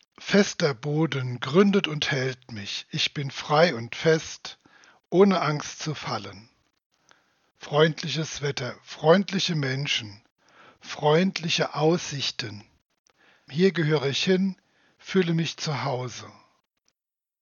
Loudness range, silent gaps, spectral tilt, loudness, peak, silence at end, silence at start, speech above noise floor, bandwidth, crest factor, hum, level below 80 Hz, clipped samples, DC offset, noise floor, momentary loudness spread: 3 LU; 6.86-6.90 s, 10.31-10.36 s, 12.99-13.04 s; -5 dB/octave; -25 LUFS; -4 dBFS; 1.1 s; 0.2 s; 64 dB; 7.2 kHz; 22 dB; none; -68 dBFS; under 0.1%; under 0.1%; -88 dBFS; 15 LU